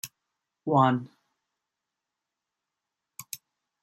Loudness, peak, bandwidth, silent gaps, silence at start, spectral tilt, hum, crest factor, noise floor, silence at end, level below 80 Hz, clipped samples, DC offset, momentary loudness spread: -25 LUFS; -8 dBFS; 15 kHz; none; 0.05 s; -6 dB/octave; none; 24 dB; -87 dBFS; 0.45 s; -74 dBFS; under 0.1%; under 0.1%; 25 LU